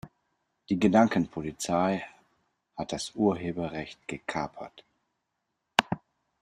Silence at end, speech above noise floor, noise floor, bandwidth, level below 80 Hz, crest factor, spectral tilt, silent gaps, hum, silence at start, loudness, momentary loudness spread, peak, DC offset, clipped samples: 0.45 s; 53 dB; -82 dBFS; 13.5 kHz; -62 dBFS; 28 dB; -5 dB/octave; none; none; 0.05 s; -29 LUFS; 16 LU; -2 dBFS; under 0.1%; under 0.1%